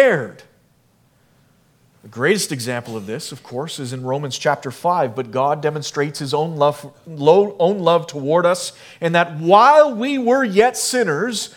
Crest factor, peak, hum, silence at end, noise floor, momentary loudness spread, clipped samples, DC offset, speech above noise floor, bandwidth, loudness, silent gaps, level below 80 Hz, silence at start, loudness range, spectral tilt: 18 dB; 0 dBFS; none; 0.1 s; -58 dBFS; 14 LU; under 0.1%; under 0.1%; 40 dB; 18 kHz; -18 LUFS; none; -66 dBFS; 0 s; 9 LU; -4.5 dB/octave